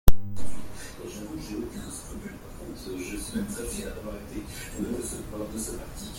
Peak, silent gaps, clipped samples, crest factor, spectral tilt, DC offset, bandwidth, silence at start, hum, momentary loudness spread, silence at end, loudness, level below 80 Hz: -2 dBFS; none; under 0.1%; 22 dB; -5 dB/octave; under 0.1%; 16.5 kHz; 0.05 s; none; 8 LU; 0 s; -36 LUFS; -34 dBFS